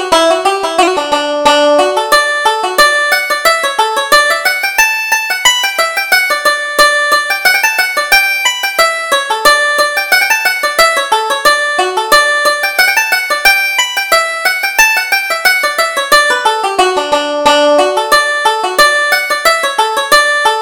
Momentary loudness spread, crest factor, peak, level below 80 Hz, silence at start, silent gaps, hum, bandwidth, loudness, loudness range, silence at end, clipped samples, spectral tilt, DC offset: 4 LU; 10 dB; 0 dBFS; -44 dBFS; 0 s; none; none; over 20 kHz; -9 LUFS; 1 LU; 0 s; 0.2%; 0.5 dB/octave; under 0.1%